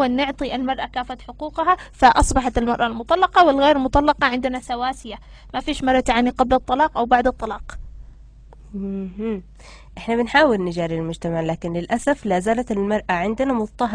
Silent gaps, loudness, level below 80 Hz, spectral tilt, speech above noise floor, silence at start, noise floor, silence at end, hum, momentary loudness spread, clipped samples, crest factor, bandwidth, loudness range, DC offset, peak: none; -20 LUFS; -36 dBFS; -5 dB/octave; 23 dB; 0 s; -43 dBFS; 0 s; none; 15 LU; under 0.1%; 20 dB; 10.5 kHz; 6 LU; under 0.1%; -2 dBFS